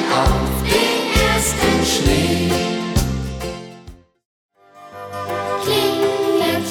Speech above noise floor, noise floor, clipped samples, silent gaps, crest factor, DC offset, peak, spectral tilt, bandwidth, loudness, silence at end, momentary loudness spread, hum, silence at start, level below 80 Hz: 25 dB; -41 dBFS; under 0.1%; 4.25-4.49 s; 16 dB; under 0.1%; -2 dBFS; -4 dB/octave; 20 kHz; -18 LUFS; 0 s; 13 LU; none; 0 s; -28 dBFS